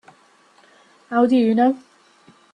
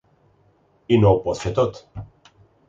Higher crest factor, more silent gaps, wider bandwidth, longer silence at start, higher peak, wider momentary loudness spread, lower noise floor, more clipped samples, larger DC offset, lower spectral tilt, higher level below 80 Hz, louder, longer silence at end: about the same, 16 dB vs 18 dB; neither; first, 8.8 kHz vs 7.8 kHz; first, 1.1 s vs 0.9 s; about the same, -6 dBFS vs -4 dBFS; second, 9 LU vs 23 LU; second, -55 dBFS vs -60 dBFS; neither; neither; about the same, -7 dB/octave vs -7.5 dB/octave; second, -68 dBFS vs -44 dBFS; about the same, -18 LUFS vs -20 LUFS; about the same, 0.75 s vs 0.65 s